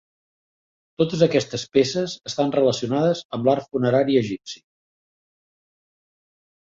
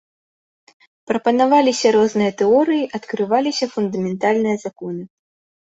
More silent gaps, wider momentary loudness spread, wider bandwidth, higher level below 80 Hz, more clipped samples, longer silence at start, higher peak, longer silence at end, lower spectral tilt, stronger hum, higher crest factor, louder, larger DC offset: first, 3.25-3.29 s vs none; about the same, 9 LU vs 11 LU; about the same, 7.8 kHz vs 8 kHz; about the same, -62 dBFS vs -64 dBFS; neither; about the same, 1 s vs 1.1 s; about the same, -4 dBFS vs -2 dBFS; first, 2.1 s vs 0.7 s; about the same, -5.5 dB/octave vs -5 dB/octave; neither; about the same, 20 dB vs 16 dB; second, -21 LUFS vs -18 LUFS; neither